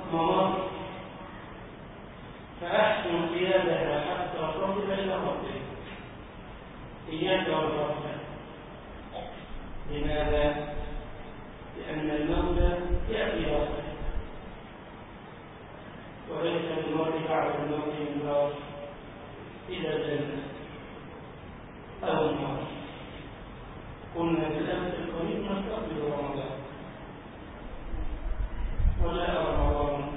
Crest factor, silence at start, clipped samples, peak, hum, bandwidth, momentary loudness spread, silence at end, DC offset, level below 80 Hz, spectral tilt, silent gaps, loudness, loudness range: 20 dB; 0 s; under 0.1%; -12 dBFS; none; 4 kHz; 18 LU; 0 s; under 0.1%; -40 dBFS; -10 dB/octave; none; -31 LUFS; 6 LU